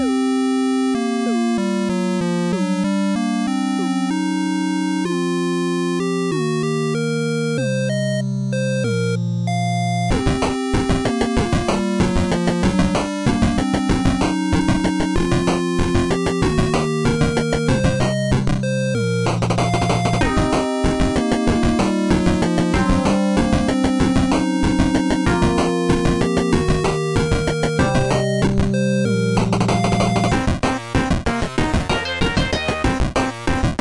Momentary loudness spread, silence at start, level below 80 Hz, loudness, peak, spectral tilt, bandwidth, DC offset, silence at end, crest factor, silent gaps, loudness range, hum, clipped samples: 3 LU; 0 s; -30 dBFS; -19 LUFS; -6 dBFS; -6 dB/octave; 11.5 kHz; under 0.1%; 0.05 s; 12 dB; none; 3 LU; none; under 0.1%